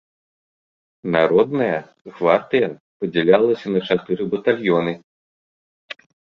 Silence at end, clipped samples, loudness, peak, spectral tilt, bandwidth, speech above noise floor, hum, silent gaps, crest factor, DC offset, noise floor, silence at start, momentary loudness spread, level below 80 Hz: 0.45 s; under 0.1%; -19 LUFS; -2 dBFS; -8 dB/octave; 6.4 kHz; over 72 dB; none; 2.01-2.05 s, 2.80-3.00 s, 5.04-5.88 s; 20 dB; under 0.1%; under -90 dBFS; 1.05 s; 18 LU; -62 dBFS